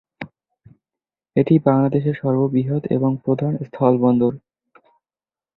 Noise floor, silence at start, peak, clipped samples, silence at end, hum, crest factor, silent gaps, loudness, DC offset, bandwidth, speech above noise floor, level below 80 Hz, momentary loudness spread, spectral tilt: under -90 dBFS; 0.2 s; -2 dBFS; under 0.1%; 1.2 s; none; 18 dB; none; -19 LUFS; under 0.1%; 4.2 kHz; over 72 dB; -58 dBFS; 14 LU; -12 dB/octave